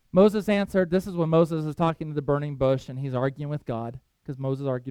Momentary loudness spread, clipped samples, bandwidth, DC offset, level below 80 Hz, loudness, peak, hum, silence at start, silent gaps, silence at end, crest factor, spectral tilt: 12 LU; under 0.1%; 15 kHz; under 0.1%; -52 dBFS; -25 LUFS; -6 dBFS; none; 0.15 s; none; 0 s; 18 dB; -8 dB/octave